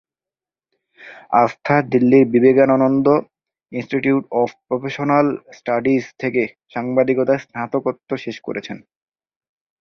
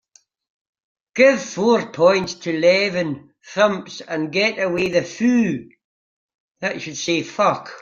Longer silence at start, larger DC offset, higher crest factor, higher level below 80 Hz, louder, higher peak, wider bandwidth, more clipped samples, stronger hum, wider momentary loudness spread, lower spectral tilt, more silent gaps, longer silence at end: second, 1 s vs 1.15 s; neither; about the same, 18 dB vs 20 dB; about the same, -60 dBFS vs -62 dBFS; about the same, -18 LUFS vs -19 LUFS; about the same, -2 dBFS vs -2 dBFS; second, 6.6 kHz vs 7.6 kHz; neither; neither; about the same, 14 LU vs 12 LU; first, -8 dB/octave vs -4.5 dB/octave; second, none vs 5.84-6.55 s; first, 1.05 s vs 0 s